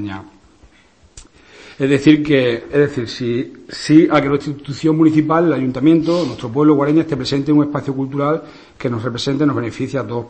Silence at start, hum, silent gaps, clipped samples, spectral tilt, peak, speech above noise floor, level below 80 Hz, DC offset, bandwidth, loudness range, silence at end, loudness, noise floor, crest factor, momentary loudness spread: 0 s; none; none; under 0.1%; -7 dB/octave; 0 dBFS; 35 dB; -48 dBFS; 0.1%; 8.8 kHz; 3 LU; 0 s; -16 LUFS; -51 dBFS; 16 dB; 11 LU